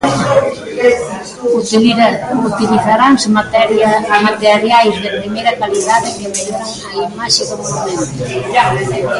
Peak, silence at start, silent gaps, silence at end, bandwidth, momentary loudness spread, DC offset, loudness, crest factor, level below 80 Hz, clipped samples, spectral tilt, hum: 0 dBFS; 0 s; none; 0 s; 11.5 kHz; 10 LU; under 0.1%; -12 LUFS; 12 dB; -46 dBFS; under 0.1%; -4 dB/octave; none